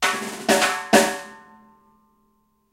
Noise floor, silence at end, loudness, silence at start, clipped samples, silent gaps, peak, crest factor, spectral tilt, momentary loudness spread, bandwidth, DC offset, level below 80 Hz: -65 dBFS; 1.35 s; -19 LUFS; 0 s; under 0.1%; none; 0 dBFS; 24 dB; -2 dB/octave; 15 LU; 16 kHz; under 0.1%; -66 dBFS